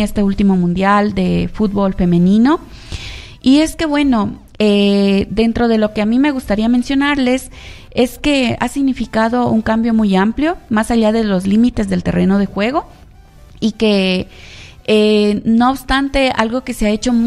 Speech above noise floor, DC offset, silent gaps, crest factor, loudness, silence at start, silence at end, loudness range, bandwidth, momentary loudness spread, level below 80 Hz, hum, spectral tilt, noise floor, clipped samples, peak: 27 dB; under 0.1%; none; 14 dB; -14 LUFS; 0 s; 0 s; 2 LU; 13 kHz; 8 LU; -32 dBFS; none; -6 dB/octave; -40 dBFS; under 0.1%; 0 dBFS